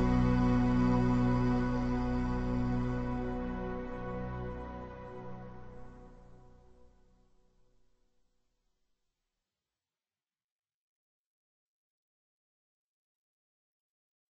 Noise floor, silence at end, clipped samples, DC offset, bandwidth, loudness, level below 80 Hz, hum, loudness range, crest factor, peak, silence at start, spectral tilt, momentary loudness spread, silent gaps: under -90 dBFS; 7.95 s; under 0.1%; under 0.1%; 7.8 kHz; -32 LUFS; -44 dBFS; none; 21 LU; 18 dB; -18 dBFS; 0 s; -8.5 dB/octave; 18 LU; none